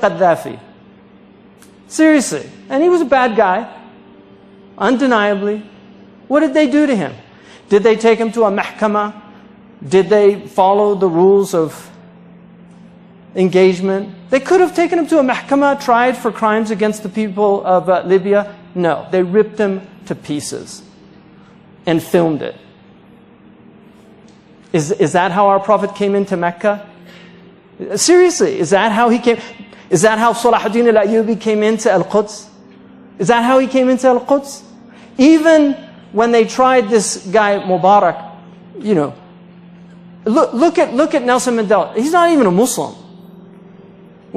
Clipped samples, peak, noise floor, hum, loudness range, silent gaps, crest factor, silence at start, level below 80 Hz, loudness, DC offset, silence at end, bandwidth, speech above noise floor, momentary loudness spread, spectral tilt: under 0.1%; 0 dBFS; -43 dBFS; none; 6 LU; none; 14 dB; 0 s; -58 dBFS; -14 LUFS; under 0.1%; 0.9 s; 14.5 kHz; 30 dB; 13 LU; -5 dB/octave